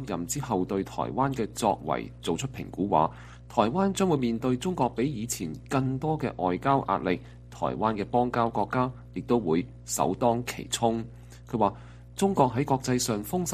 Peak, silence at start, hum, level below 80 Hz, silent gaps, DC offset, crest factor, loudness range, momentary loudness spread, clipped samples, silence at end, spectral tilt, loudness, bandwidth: -8 dBFS; 0 s; none; -50 dBFS; none; under 0.1%; 20 dB; 1 LU; 8 LU; under 0.1%; 0 s; -5.5 dB/octave; -28 LUFS; 15 kHz